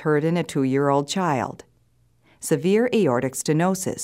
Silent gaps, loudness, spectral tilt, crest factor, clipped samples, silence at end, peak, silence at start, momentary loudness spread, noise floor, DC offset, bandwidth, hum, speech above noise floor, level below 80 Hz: none; -22 LUFS; -5.5 dB/octave; 16 dB; under 0.1%; 0 s; -6 dBFS; 0 s; 6 LU; -62 dBFS; under 0.1%; 16 kHz; none; 41 dB; -64 dBFS